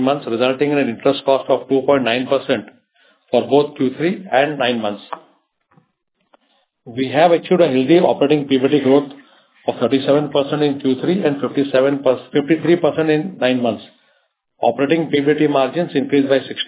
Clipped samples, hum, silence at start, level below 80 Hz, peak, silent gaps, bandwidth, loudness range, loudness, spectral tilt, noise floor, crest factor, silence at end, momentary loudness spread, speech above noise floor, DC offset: under 0.1%; none; 0 s; -66 dBFS; 0 dBFS; none; 4 kHz; 4 LU; -17 LUFS; -10.5 dB/octave; -68 dBFS; 16 dB; 0 s; 8 LU; 52 dB; under 0.1%